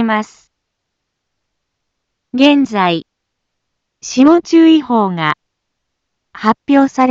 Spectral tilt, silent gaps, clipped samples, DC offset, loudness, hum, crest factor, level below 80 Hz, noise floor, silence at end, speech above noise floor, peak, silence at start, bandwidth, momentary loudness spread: -5 dB/octave; none; under 0.1%; under 0.1%; -12 LUFS; none; 14 dB; -58 dBFS; -74 dBFS; 0 s; 63 dB; 0 dBFS; 0 s; 7.6 kHz; 14 LU